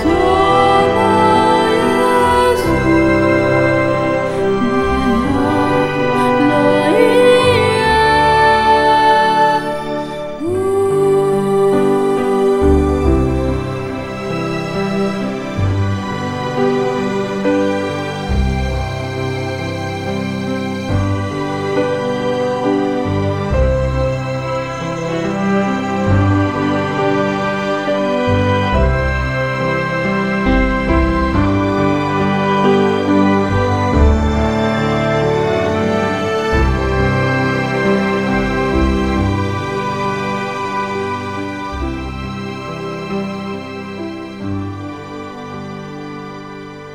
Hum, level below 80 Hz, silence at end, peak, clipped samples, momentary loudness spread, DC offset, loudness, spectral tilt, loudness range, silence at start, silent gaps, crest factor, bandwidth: none; -26 dBFS; 0 s; 0 dBFS; under 0.1%; 12 LU; 0.4%; -15 LUFS; -6.5 dB/octave; 8 LU; 0 s; none; 14 dB; 14.5 kHz